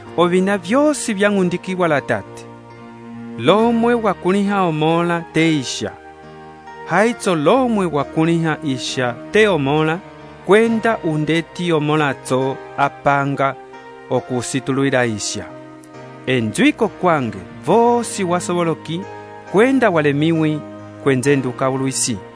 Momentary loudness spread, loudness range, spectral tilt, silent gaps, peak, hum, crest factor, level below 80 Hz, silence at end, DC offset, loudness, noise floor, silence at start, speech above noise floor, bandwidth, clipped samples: 20 LU; 2 LU; -5 dB/octave; none; 0 dBFS; none; 18 dB; -54 dBFS; 0 s; under 0.1%; -17 LUFS; -38 dBFS; 0 s; 21 dB; 11 kHz; under 0.1%